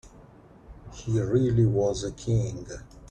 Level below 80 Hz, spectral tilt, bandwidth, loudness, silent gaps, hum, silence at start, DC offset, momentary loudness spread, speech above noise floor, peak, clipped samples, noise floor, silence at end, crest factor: -46 dBFS; -7.5 dB/octave; 8.8 kHz; -26 LUFS; none; none; 0.05 s; under 0.1%; 19 LU; 26 dB; -12 dBFS; under 0.1%; -51 dBFS; 0.05 s; 16 dB